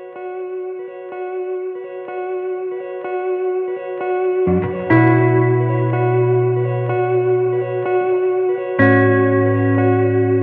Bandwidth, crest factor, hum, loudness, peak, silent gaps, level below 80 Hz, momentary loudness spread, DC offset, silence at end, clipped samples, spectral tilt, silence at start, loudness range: 3.8 kHz; 16 dB; none; -17 LUFS; -2 dBFS; none; -54 dBFS; 14 LU; under 0.1%; 0 s; under 0.1%; -12 dB/octave; 0 s; 8 LU